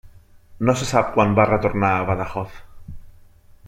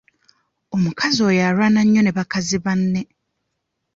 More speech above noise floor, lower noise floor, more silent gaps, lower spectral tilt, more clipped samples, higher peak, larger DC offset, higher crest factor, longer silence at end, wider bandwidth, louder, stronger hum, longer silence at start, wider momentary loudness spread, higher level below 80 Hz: second, 29 dB vs 58 dB; second, -48 dBFS vs -75 dBFS; neither; about the same, -6 dB/octave vs -5 dB/octave; neither; about the same, -2 dBFS vs -4 dBFS; neither; first, 20 dB vs 14 dB; second, 0 s vs 0.9 s; first, 15 kHz vs 7.6 kHz; about the same, -20 LUFS vs -18 LUFS; neither; second, 0.05 s vs 0.7 s; about the same, 11 LU vs 9 LU; first, -42 dBFS vs -54 dBFS